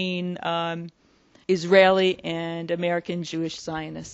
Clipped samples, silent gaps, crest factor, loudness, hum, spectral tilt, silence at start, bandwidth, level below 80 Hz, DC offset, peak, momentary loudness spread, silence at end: under 0.1%; none; 22 dB; -24 LUFS; none; -5.5 dB/octave; 0 s; 8 kHz; -62 dBFS; under 0.1%; -2 dBFS; 15 LU; 0 s